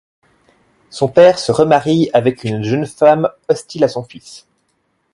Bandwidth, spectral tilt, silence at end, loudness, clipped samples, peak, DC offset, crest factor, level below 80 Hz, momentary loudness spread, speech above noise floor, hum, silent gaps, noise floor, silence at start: 11.5 kHz; -6 dB/octave; 0.75 s; -14 LUFS; under 0.1%; 0 dBFS; under 0.1%; 16 dB; -54 dBFS; 14 LU; 51 dB; none; none; -65 dBFS; 0.95 s